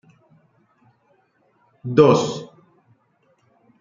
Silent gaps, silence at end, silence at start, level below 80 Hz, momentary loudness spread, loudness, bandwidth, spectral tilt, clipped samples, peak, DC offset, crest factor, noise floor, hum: none; 1.35 s; 1.85 s; -62 dBFS; 22 LU; -17 LUFS; 7.6 kHz; -6.5 dB/octave; under 0.1%; -2 dBFS; under 0.1%; 22 dB; -63 dBFS; none